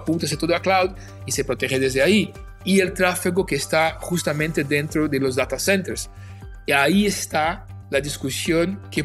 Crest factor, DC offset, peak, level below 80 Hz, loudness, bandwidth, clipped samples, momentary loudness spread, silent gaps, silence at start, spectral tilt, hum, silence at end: 18 dB; under 0.1%; -2 dBFS; -42 dBFS; -21 LUFS; 14.5 kHz; under 0.1%; 12 LU; none; 0 s; -4.5 dB/octave; none; 0 s